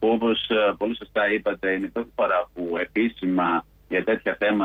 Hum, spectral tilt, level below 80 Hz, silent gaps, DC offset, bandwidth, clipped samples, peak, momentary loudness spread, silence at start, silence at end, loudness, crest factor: none; -7.5 dB/octave; -56 dBFS; none; under 0.1%; 15 kHz; under 0.1%; -12 dBFS; 6 LU; 0 s; 0 s; -24 LUFS; 12 dB